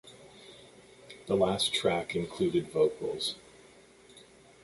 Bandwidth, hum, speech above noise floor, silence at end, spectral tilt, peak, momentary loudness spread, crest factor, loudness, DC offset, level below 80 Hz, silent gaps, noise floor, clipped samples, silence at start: 11.5 kHz; none; 27 dB; 0.45 s; -4.5 dB/octave; -14 dBFS; 24 LU; 20 dB; -30 LUFS; under 0.1%; -62 dBFS; none; -57 dBFS; under 0.1%; 0.05 s